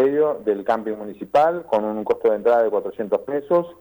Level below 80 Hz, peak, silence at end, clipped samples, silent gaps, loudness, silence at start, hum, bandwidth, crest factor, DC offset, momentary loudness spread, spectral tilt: -62 dBFS; -8 dBFS; 0.05 s; under 0.1%; none; -21 LUFS; 0 s; none; over 20 kHz; 12 dB; under 0.1%; 7 LU; -7.5 dB/octave